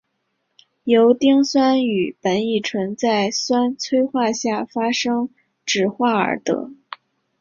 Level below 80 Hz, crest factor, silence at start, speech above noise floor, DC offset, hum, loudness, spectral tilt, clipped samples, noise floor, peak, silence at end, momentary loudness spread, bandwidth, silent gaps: -64 dBFS; 16 dB; 0.85 s; 54 dB; under 0.1%; none; -19 LUFS; -4 dB/octave; under 0.1%; -72 dBFS; -4 dBFS; 0.65 s; 13 LU; 7.4 kHz; none